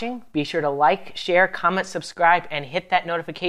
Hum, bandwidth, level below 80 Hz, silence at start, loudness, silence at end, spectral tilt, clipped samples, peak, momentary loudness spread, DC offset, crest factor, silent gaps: none; 13.5 kHz; -62 dBFS; 0 s; -21 LUFS; 0 s; -4.5 dB/octave; under 0.1%; -4 dBFS; 9 LU; under 0.1%; 18 dB; none